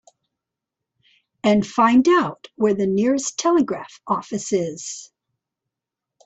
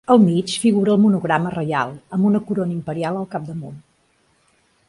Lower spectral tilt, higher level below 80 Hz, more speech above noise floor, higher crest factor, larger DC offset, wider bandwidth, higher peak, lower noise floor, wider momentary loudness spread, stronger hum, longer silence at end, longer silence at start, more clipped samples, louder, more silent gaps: second, -5 dB/octave vs -6.5 dB/octave; about the same, -62 dBFS vs -58 dBFS; first, 66 dB vs 43 dB; about the same, 16 dB vs 18 dB; neither; second, 8.4 kHz vs 11.5 kHz; second, -6 dBFS vs -2 dBFS; first, -85 dBFS vs -61 dBFS; about the same, 13 LU vs 13 LU; neither; about the same, 1.2 s vs 1.1 s; first, 1.45 s vs 0.1 s; neither; about the same, -20 LUFS vs -19 LUFS; neither